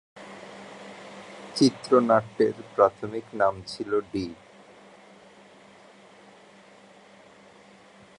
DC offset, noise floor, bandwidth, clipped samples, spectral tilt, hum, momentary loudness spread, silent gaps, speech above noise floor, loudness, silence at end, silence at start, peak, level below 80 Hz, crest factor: under 0.1%; -53 dBFS; 11 kHz; under 0.1%; -5.5 dB/octave; none; 22 LU; none; 28 dB; -25 LUFS; 3.85 s; 0.15 s; -4 dBFS; -64 dBFS; 24 dB